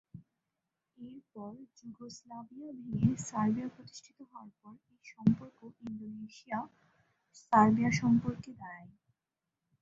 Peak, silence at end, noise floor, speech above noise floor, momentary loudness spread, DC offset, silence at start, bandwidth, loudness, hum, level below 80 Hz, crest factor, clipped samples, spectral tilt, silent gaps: -10 dBFS; 0.95 s; -89 dBFS; 55 dB; 24 LU; under 0.1%; 0.15 s; 8 kHz; -31 LUFS; none; -66 dBFS; 24 dB; under 0.1%; -6.5 dB/octave; none